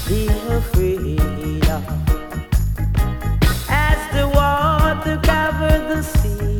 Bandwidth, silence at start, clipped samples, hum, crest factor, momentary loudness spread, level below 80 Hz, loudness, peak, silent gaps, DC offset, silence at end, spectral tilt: 18.5 kHz; 0 s; under 0.1%; none; 18 dB; 5 LU; -20 dBFS; -19 LUFS; 0 dBFS; none; under 0.1%; 0 s; -6 dB/octave